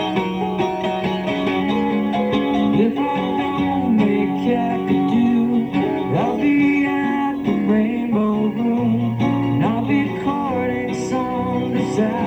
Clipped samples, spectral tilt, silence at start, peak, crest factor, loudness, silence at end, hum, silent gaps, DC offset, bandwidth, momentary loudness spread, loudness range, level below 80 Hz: under 0.1%; -7.5 dB/octave; 0 s; -6 dBFS; 12 dB; -19 LUFS; 0 s; none; none; under 0.1%; 8.6 kHz; 5 LU; 2 LU; -48 dBFS